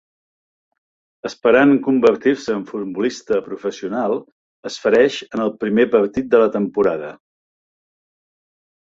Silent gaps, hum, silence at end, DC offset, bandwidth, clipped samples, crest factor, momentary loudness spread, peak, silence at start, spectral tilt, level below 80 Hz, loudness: 4.32-4.63 s; none; 1.75 s; under 0.1%; 7.8 kHz; under 0.1%; 18 dB; 13 LU; -2 dBFS; 1.25 s; -5.5 dB/octave; -58 dBFS; -18 LUFS